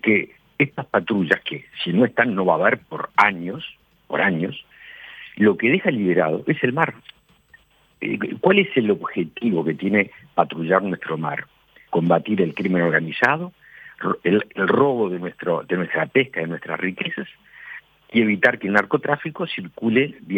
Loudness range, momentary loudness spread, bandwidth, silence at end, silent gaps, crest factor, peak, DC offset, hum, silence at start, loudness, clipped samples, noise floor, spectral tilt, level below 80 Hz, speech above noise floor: 2 LU; 12 LU; 8.4 kHz; 0 s; none; 20 dB; -2 dBFS; under 0.1%; none; 0.05 s; -21 LUFS; under 0.1%; -55 dBFS; -7.5 dB/octave; -66 dBFS; 34 dB